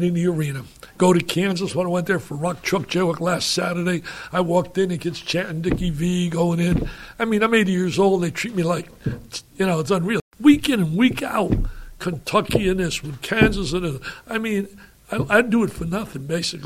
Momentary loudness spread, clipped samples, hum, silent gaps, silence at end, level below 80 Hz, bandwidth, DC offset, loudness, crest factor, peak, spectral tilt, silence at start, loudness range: 10 LU; under 0.1%; none; 10.21-10.31 s; 0 s; -38 dBFS; 15.5 kHz; under 0.1%; -21 LUFS; 20 dB; -2 dBFS; -5.5 dB/octave; 0 s; 2 LU